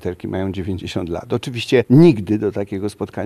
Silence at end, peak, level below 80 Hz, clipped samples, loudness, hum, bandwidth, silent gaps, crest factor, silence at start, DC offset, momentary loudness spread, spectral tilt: 0 s; -2 dBFS; -48 dBFS; under 0.1%; -18 LUFS; none; 13 kHz; none; 16 dB; 0 s; under 0.1%; 14 LU; -7.5 dB/octave